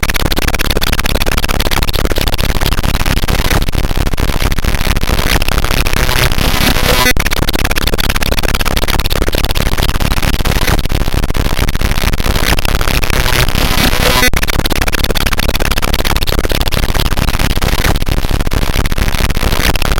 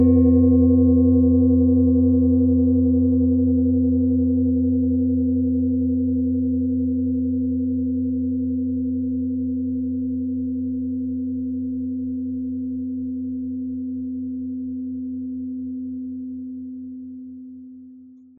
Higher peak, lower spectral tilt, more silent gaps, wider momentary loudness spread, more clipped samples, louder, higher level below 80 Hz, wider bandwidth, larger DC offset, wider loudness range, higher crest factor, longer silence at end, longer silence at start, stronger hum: first, 0 dBFS vs -6 dBFS; second, -3.5 dB/octave vs -16.5 dB/octave; neither; second, 4 LU vs 14 LU; neither; first, -14 LUFS vs -21 LUFS; first, -14 dBFS vs -38 dBFS; first, 17.5 kHz vs 1.2 kHz; neither; second, 2 LU vs 12 LU; about the same, 10 dB vs 14 dB; second, 0 s vs 0.25 s; about the same, 0 s vs 0 s; neither